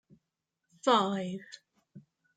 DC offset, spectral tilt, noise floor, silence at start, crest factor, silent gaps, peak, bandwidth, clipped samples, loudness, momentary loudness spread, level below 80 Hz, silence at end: under 0.1%; -5 dB/octave; -86 dBFS; 0.85 s; 22 dB; none; -12 dBFS; 9.4 kHz; under 0.1%; -30 LUFS; 24 LU; -82 dBFS; 0.35 s